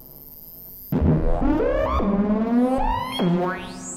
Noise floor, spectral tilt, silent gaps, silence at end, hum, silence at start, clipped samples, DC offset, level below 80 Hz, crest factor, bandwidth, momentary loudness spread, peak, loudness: -42 dBFS; -7 dB/octave; none; 0 s; none; 0 s; under 0.1%; under 0.1%; -30 dBFS; 14 dB; 17 kHz; 18 LU; -8 dBFS; -22 LUFS